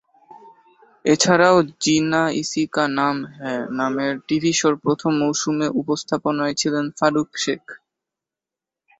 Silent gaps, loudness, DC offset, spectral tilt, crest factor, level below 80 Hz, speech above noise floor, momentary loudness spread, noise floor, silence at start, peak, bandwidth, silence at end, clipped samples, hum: none; -20 LUFS; under 0.1%; -4 dB/octave; 20 dB; -62 dBFS; 68 dB; 9 LU; -88 dBFS; 0.3 s; -2 dBFS; 8.4 kHz; 1.25 s; under 0.1%; none